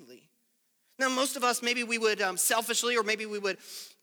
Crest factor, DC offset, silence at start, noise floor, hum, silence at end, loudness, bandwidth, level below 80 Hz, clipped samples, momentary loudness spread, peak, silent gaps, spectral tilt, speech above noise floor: 16 dB; under 0.1%; 0 s; -73 dBFS; none; 0.15 s; -28 LUFS; over 20 kHz; under -90 dBFS; under 0.1%; 8 LU; -16 dBFS; none; -0.5 dB/octave; 44 dB